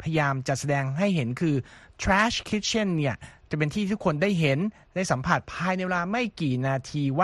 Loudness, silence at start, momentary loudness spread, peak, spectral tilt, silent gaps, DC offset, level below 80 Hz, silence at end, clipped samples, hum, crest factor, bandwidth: -26 LUFS; 0 s; 7 LU; -6 dBFS; -5.5 dB/octave; none; under 0.1%; -48 dBFS; 0 s; under 0.1%; none; 20 dB; 12.5 kHz